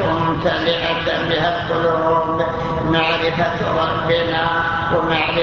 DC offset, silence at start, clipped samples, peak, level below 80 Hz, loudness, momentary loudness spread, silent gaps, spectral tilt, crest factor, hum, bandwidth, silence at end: under 0.1%; 0 s; under 0.1%; -4 dBFS; -38 dBFS; -18 LUFS; 2 LU; none; -6.5 dB/octave; 14 dB; none; 7.2 kHz; 0 s